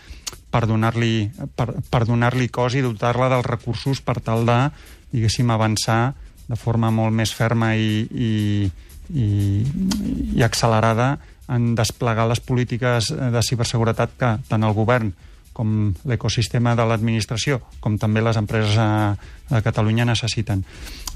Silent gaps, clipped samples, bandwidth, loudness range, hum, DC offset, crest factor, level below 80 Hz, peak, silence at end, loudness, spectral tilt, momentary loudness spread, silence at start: none; under 0.1%; 14.5 kHz; 1 LU; none; under 0.1%; 14 dB; -40 dBFS; -6 dBFS; 0 s; -21 LUFS; -6 dB/octave; 7 LU; 0.1 s